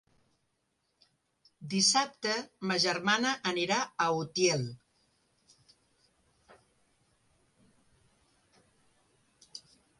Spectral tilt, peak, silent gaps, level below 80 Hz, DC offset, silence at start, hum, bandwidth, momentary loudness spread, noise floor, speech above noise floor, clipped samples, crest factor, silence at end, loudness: -2.5 dB/octave; -14 dBFS; none; -76 dBFS; under 0.1%; 1.6 s; none; 11.5 kHz; 24 LU; -79 dBFS; 48 dB; under 0.1%; 22 dB; 0.4 s; -29 LUFS